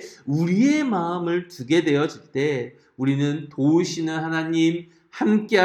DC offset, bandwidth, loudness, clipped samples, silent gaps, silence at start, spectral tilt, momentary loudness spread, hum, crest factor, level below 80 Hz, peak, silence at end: under 0.1%; 11 kHz; -22 LUFS; under 0.1%; none; 0 s; -6 dB/octave; 8 LU; none; 18 dB; -70 dBFS; -4 dBFS; 0 s